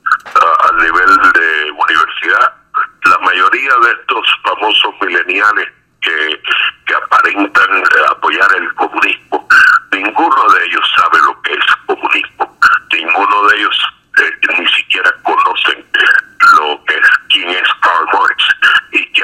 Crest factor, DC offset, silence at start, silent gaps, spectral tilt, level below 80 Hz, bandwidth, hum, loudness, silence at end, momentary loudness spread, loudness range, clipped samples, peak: 10 dB; under 0.1%; 0.05 s; none; -1 dB/octave; -50 dBFS; 16 kHz; none; -9 LUFS; 0 s; 6 LU; 2 LU; 0.3%; 0 dBFS